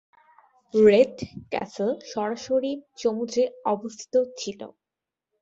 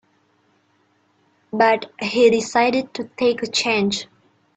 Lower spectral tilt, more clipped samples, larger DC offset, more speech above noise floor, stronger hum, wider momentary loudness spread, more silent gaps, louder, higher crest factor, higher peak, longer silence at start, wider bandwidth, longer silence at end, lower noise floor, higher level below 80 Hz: first, -5 dB/octave vs -3.5 dB/octave; neither; neither; first, 64 dB vs 44 dB; neither; first, 16 LU vs 12 LU; neither; second, -25 LUFS vs -19 LUFS; about the same, 20 dB vs 18 dB; second, -6 dBFS vs -2 dBFS; second, 0.75 s vs 1.55 s; second, 7.8 kHz vs 9 kHz; first, 0.75 s vs 0.55 s; first, -88 dBFS vs -63 dBFS; about the same, -64 dBFS vs -64 dBFS